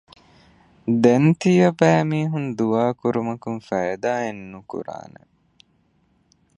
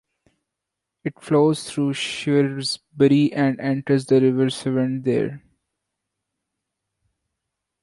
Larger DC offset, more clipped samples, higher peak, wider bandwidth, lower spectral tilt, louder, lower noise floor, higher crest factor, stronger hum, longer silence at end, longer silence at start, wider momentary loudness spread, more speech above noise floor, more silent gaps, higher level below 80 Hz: neither; neither; about the same, -2 dBFS vs -4 dBFS; second, 10 kHz vs 11.5 kHz; first, -7.5 dB/octave vs -6 dB/octave; about the same, -20 LUFS vs -21 LUFS; second, -63 dBFS vs -83 dBFS; about the same, 20 dB vs 18 dB; neither; second, 1.6 s vs 2.45 s; second, 0.85 s vs 1.05 s; first, 17 LU vs 9 LU; second, 43 dB vs 63 dB; neither; about the same, -62 dBFS vs -62 dBFS